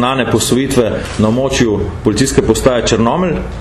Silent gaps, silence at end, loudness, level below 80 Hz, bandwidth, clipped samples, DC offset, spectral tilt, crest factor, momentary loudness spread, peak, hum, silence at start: none; 0 s; -13 LUFS; -28 dBFS; 14 kHz; under 0.1%; under 0.1%; -5 dB/octave; 12 dB; 4 LU; 0 dBFS; none; 0 s